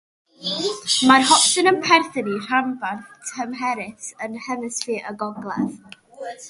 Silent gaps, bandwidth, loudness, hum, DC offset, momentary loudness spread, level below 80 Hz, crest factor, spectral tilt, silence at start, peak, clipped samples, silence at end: none; 11.5 kHz; -20 LUFS; none; under 0.1%; 17 LU; -68 dBFS; 22 dB; -2 dB/octave; 0.4 s; 0 dBFS; under 0.1%; 0 s